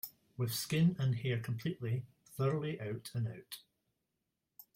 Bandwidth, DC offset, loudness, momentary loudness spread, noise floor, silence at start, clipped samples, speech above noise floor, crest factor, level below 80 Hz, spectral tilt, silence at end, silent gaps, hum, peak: 16 kHz; under 0.1%; -37 LUFS; 16 LU; -87 dBFS; 0.05 s; under 0.1%; 51 dB; 16 dB; -72 dBFS; -6 dB/octave; 0.15 s; none; none; -22 dBFS